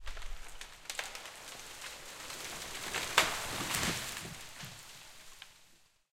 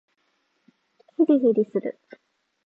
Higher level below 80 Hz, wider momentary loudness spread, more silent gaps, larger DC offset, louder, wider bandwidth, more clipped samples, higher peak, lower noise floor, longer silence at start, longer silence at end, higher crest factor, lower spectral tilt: first, -52 dBFS vs -82 dBFS; first, 21 LU vs 16 LU; neither; neither; second, -37 LUFS vs -22 LUFS; first, 16.5 kHz vs 3.9 kHz; neither; about the same, -8 dBFS vs -8 dBFS; second, -64 dBFS vs -71 dBFS; second, 0 s vs 1.2 s; second, 0.25 s vs 0.75 s; first, 30 dB vs 18 dB; second, -1.5 dB/octave vs -10 dB/octave